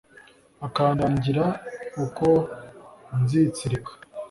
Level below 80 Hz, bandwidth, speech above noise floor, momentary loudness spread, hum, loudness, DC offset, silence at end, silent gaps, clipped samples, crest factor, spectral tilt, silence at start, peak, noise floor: -52 dBFS; 11.5 kHz; 29 dB; 17 LU; none; -24 LUFS; under 0.1%; 0.05 s; none; under 0.1%; 18 dB; -7.5 dB/octave; 0.6 s; -8 dBFS; -53 dBFS